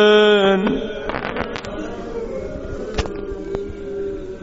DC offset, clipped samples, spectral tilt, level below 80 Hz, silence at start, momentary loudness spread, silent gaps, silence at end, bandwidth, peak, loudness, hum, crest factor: under 0.1%; under 0.1%; -3 dB/octave; -36 dBFS; 0 s; 15 LU; none; 0 s; 7.8 kHz; -2 dBFS; -21 LUFS; none; 18 dB